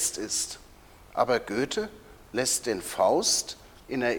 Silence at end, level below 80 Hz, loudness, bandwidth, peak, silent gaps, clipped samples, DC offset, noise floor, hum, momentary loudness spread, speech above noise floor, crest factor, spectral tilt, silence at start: 0 s; -56 dBFS; -27 LUFS; over 20 kHz; -8 dBFS; none; under 0.1%; under 0.1%; -52 dBFS; none; 15 LU; 25 dB; 20 dB; -2 dB/octave; 0 s